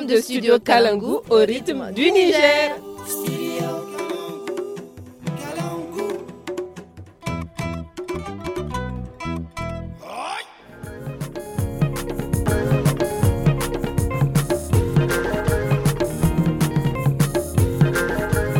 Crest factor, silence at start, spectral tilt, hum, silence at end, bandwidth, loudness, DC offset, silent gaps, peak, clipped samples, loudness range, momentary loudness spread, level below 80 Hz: 20 dB; 0 s; -6 dB/octave; none; 0 s; 17 kHz; -22 LUFS; under 0.1%; none; -2 dBFS; under 0.1%; 11 LU; 15 LU; -36 dBFS